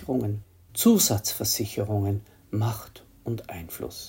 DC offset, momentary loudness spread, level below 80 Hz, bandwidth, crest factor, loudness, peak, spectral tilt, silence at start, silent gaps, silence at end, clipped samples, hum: under 0.1%; 17 LU; -56 dBFS; 17 kHz; 20 dB; -26 LUFS; -8 dBFS; -4.5 dB/octave; 0 s; none; 0 s; under 0.1%; none